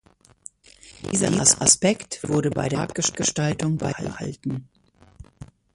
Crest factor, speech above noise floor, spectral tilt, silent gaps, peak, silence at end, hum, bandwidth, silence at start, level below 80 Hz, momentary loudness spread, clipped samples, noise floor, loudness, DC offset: 24 dB; 27 dB; -3.5 dB/octave; none; 0 dBFS; 0.3 s; none; 11.5 kHz; 0.85 s; -52 dBFS; 15 LU; under 0.1%; -50 dBFS; -22 LUFS; under 0.1%